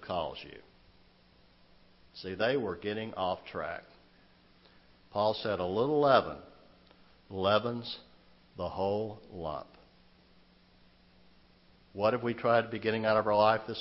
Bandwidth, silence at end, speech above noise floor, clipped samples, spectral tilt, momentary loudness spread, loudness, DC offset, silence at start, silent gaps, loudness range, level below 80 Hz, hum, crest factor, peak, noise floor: 5.8 kHz; 0 s; 32 dB; under 0.1%; -9 dB/octave; 18 LU; -31 LUFS; under 0.1%; 0 s; none; 9 LU; -64 dBFS; none; 24 dB; -10 dBFS; -63 dBFS